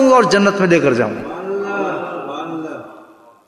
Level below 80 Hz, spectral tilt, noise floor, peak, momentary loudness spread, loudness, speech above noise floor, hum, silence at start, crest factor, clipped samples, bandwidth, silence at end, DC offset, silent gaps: -56 dBFS; -5.5 dB/octave; -44 dBFS; 0 dBFS; 15 LU; -17 LUFS; 30 dB; none; 0 s; 16 dB; under 0.1%; 11.5 kHz; 0.45 s; under 0.1%; none